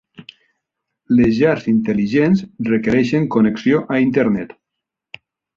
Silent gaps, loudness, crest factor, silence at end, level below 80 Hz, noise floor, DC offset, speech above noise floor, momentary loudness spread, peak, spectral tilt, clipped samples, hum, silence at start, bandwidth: none; -16 LUFS; 14 dB; 1.1 s; -48 dBFS; -81 dBFS; under 0.1%; 66 dB; 4 LU; -2 dBFS; -8 dB/octave; under 0.1%; none; 0.2 s; 7.2 kHz